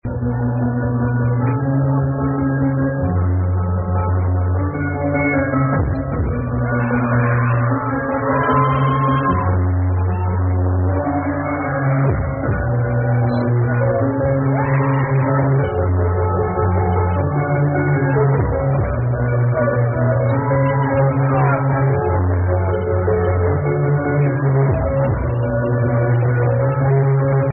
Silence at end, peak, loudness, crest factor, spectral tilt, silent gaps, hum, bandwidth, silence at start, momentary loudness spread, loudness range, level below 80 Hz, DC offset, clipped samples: 0 s; -4 dBFS; -18 LUFS; 12 dB; -6 dB/octave; none; none; 3.2 kHz; 0.05 s; 4 LU; 2 LU; -34 dBFS; under 0.1%; under 0.1%